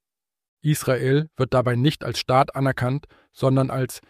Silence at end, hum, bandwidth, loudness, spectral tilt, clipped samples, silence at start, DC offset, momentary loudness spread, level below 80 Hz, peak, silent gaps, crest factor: 0.1 s; none; 15.5 kHz; -22 LUFS; -6 dB/octave; under 0.1%; 0.65 s; under 0.1%; 6 LU; -52 dBFS; -4 dBFS; none; 18 dB